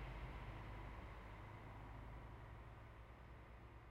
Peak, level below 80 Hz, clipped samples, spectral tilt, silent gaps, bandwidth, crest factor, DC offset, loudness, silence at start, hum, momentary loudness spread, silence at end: -40 dBFS; -58 dBFS; under 0.1%; -7 dB/octave; none; 15.5 kHz; 14 dB; under 0.1%; -57 LUFS; 0 s; none; 7 LU; 0 s